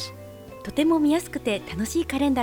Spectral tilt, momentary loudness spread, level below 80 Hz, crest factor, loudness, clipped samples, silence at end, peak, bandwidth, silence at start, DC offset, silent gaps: -4.5 dB/octave; 18 LU; -48 dBFS; 16 dB; -24 LUFS; under 0.1%; 0 s; -10 dBFS; 18.5 kHz; 0 s; under 0.1%; none